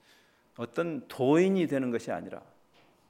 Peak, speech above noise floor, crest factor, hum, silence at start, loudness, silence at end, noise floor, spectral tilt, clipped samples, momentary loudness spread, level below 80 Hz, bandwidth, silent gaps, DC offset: -12 dBFS; 35 dB; 18 dB; none; 0.6 s; -29 LUFS; 0.7 s; -63 dBFS; -7 dB/octave; under 0.1%; 18 LU; -78 dBFS; 15.5 kHz; none; under 0.1%